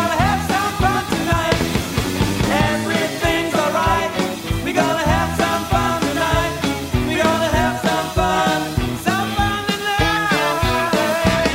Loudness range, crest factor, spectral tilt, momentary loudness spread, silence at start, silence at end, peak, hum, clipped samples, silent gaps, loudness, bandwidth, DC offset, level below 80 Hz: 1 LU; 14 dB; -4.5 dB/octave; 4 LU; 0 s; 0 s; -4 dBFS; none; under 0.1%; none; -18 LUFS; 16.5 kHz; under 0.1%; -32 dBFS